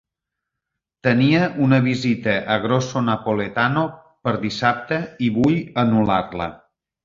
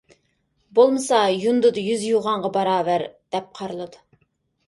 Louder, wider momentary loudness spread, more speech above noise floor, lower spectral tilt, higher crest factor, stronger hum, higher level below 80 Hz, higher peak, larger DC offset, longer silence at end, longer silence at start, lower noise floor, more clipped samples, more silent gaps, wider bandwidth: about the same, -20 LUFS vs -21 LUFS; second, 8 LU vs 14 LU; first, 64 dB vs 48 dB; first, -6.5 dB/octave vs -4.5 dB/octave; about the same, 18 dB vs 18 dB; neither; first, -50 dBFS vs -68 dBFS; about the same, -2 dBFS vs -4 dBFS; neither; second, 0.5 s vs 0.7 s; first, 1.05 s vs 0.75 s; first, -83 dBFS vs -68 dBFS; neither; neither; second, 7.6 kHz vs 11.5 kHz